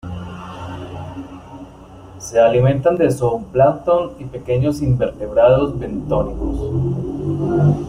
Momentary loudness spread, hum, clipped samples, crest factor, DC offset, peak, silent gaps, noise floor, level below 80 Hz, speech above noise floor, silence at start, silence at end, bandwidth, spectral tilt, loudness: 18 LU; none; under 0.1%; 16 dB; under 0.1%; -2 dBFS; none; -39 dBFS; -36 dBFS; 23 dB; 0.05 s; 0 s; 14.5 kHz; -8 dB/octave; -17 LUFS